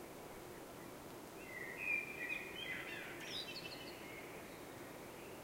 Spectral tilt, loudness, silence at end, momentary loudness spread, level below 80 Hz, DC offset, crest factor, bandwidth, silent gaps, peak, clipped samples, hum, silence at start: -3 dB/octave; -46 LUFS; 0 s; 13 LU; -72 dBFS; under 0.1%; 18 dB; 16 kHz; none; -30 dBFS; under 0.1%; none; 0 s